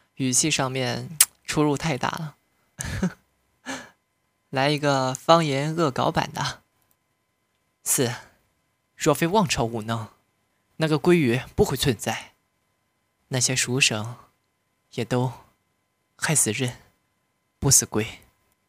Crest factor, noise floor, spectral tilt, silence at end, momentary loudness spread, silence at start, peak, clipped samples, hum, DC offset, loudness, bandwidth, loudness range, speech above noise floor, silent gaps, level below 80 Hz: 26 dB; -72 dBFS; -3.5 dB/octave; 0.55 s; 14 LU; 0.2 s; 0 dBFS; under 0.1%; none; under 0.1%; -23 LUFS; 16 kHz; 4 LU; 49 dB; none; -50 dBFS